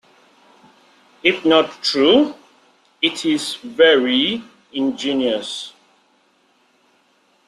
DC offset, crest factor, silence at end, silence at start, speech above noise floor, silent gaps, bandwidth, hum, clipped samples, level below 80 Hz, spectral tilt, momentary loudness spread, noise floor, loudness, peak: under 0.1%; 18 dB; 1.8 s; 1.25 s; 42 dB; none; 12.5 kHz; none; under 0.1%; -64 dBFS; -3.5 dB/octave; 14 LU; -59 dBFS; -17 LUFS; -2 dBFS